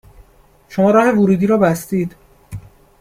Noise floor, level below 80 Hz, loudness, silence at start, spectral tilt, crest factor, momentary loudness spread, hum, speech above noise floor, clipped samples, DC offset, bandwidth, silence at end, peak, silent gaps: -49 dBFS; -48 dBFS; -15 LUFS; 0.7 s; -7.5 dB/octave; 16 dB; 23 LU; none; 36 dB; under 0.1%; under 0.1%; 16 kHz; 0.4 s; -2 dBFS; none